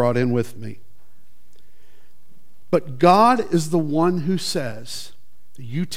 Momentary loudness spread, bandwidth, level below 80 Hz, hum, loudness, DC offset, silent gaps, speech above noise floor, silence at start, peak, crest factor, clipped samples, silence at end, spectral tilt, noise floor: 20 LU; 16 kHz; -62 dBFS; none; -20 LUFS; 3%; none; 41 dB; 0 s; 0 dBFS; 22 dB; under 0.1%; 0 s; -6 dB/octave; -61 dBFS